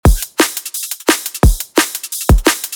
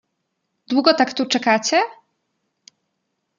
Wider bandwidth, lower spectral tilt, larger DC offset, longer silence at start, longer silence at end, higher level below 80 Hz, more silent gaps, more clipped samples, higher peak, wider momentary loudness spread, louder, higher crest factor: first, over 20 kHz vs 7.4 kHz; first, -4 dB/octave vs -2.5 dB/octave; neither; second, 0.05 s vs 0.7 s; second, 0 s vs 1.45 s; first, -18 dBFS vs -72 dBFS; neither; neither; about the same, 0 dBFS vs -2 dBFS; about the same, 6 LU vs 5 LU; first, -15 LUFS vs -18 LUFS; second, 14 dB vs 20 dB